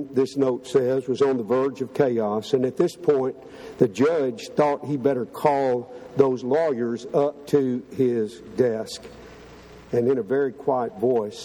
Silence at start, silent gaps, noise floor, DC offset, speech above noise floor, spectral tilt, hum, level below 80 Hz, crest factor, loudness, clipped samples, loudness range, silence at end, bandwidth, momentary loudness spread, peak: 0 s; none; -45 dBFS; under 0.1%; 22 dB; -7 dB/octave; none; -62 dBFS; 20 dB; -23 LUFS; under 0.1%; 3 LU; 0 s; 13.5 kHz; 6 LU; -4 dBFS